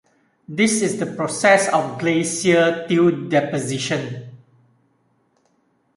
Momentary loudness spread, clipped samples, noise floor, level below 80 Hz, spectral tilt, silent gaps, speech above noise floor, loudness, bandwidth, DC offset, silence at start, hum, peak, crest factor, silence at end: 9 LU; under 0.1%; -64 dBFS; -64 dBFS; -4.5 dB/octave; none; 45 dB; -19 LUFS; 11.5 kHz; under 0.1%; 0.5 s; none; -2 dBFS; 20 dB; 1.6 s